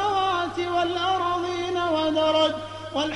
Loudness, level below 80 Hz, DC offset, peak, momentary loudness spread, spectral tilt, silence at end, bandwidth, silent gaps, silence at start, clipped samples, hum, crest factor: -24 LUFS; -56 dBFS; under 0.1%; -10 dBFS; 6 LU; -4.5 dB/octave; 0 s; 11.5 kHz; none; 0 s; under 0.1%; none; 14 dB